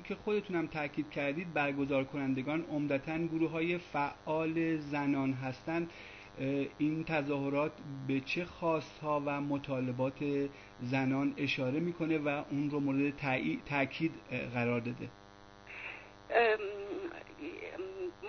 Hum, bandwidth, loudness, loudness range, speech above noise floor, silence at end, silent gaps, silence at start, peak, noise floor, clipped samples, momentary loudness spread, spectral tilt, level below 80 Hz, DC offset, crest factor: 50 Hz at -65 dBFS; 6.4 kHz; -35 LUFS; 2 LU; 21 dB; 0 s; none; 0 s; -18 dBFS; -55 dBFS; under 0.1%; 10 LU; -5 dB/octave; -64 dBFS; under 0.1%; 18 dB